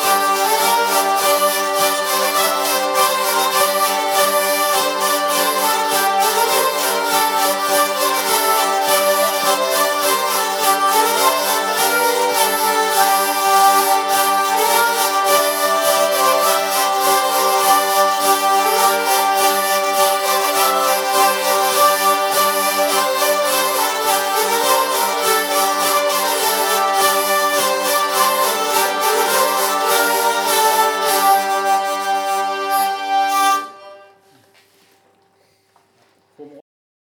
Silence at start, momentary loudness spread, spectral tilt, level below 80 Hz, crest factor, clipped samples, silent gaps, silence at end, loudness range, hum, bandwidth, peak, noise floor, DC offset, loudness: 0 s; 3 LU; 0 dB/octave; -72 dBFS; 16 dB; under 0.1%; none; 0.5 s; 2 LU; none; 19.5 kHz; -2 dBFS; -58 dBFS; under 0.1%; -15 LUFS